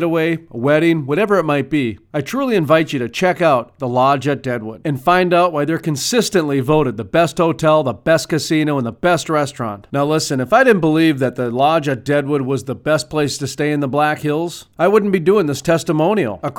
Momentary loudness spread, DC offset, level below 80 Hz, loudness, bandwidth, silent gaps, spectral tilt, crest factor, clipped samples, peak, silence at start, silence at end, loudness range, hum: 7 LU; under 0.1%; -50 dBFS; -16 LUFS; 17.5 kHz; none; -5.5 dB/octave; 16 dB; under 0.1%; 0 dBFS; 0 s; 0 s; 2 LU; none